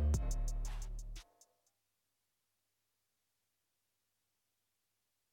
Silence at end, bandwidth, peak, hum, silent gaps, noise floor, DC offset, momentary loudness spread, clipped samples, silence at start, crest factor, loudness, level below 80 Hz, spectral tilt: 4.1 s; 16 kHz; -22 dBFS; none; none; -86 dBFS; under 0.1%; 16 LU; under 0.1%; 0 s; 20 dB; -43 LUFS; -44 dBFS; -5.5 dB/octave